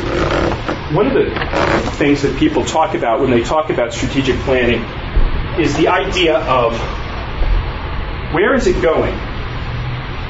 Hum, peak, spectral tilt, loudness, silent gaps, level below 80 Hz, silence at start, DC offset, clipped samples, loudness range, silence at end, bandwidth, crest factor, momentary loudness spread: none; -2 dBFS; -5.5 dB/octave; -16 LUFS; none; -24 dBFS; 0 s; under 0.1%; under 0.1%; 2 LU; 0 s; 8 kHz; 12 dB; 10 LU